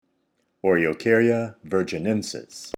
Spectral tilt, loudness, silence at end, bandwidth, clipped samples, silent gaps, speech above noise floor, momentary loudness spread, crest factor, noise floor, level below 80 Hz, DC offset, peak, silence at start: -5.5 dB/octave; -23 LUFS; 0.1 s; 15.5 kHz; under 0.1%; none; 48 dB; 8 LU; 18 dB; -71 dBFS; -62 dBFS; under 0.1%; -6 dBFS; 0.65 s